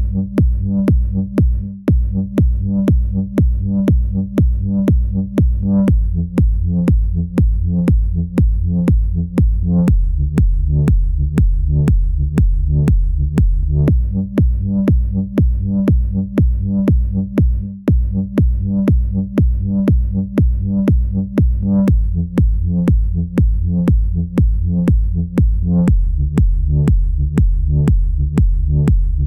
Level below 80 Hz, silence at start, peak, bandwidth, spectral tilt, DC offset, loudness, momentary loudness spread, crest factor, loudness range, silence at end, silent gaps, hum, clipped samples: -16 dBFS; 0 s; 0 dBFS; 3.6 kHz; -10 dB/octave; 0.2%; -16 LUFS; 3 LU; 14 dB; 1 LU; 0 s; none; none; under 0.1%